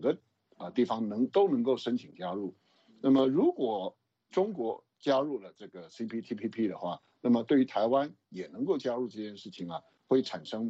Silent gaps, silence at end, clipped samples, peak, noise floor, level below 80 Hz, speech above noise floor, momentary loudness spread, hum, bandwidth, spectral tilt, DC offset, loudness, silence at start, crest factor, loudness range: none; 0 s; under 0.1%; -14 dBFS; -51 dBFS; -78 dBFS; 20 dB; 15 LU; none; 7.8 kHz; -7 dB/octave; under 0.1%; -31 LUFS; 0 s; 16 dB; 4 LU